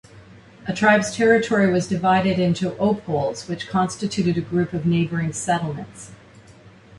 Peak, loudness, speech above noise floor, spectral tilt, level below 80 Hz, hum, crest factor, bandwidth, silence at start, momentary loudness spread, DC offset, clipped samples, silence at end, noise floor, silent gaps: -2 dBFS; -21 LUFS; 27 dB; -5.5 dB/octave; -52 dBFS; none; 18 dB; 11.5 kHz; 0.15 s; 13 LU; under 0.1%; under 0.1%; 0.05 s; -47 dBFS; none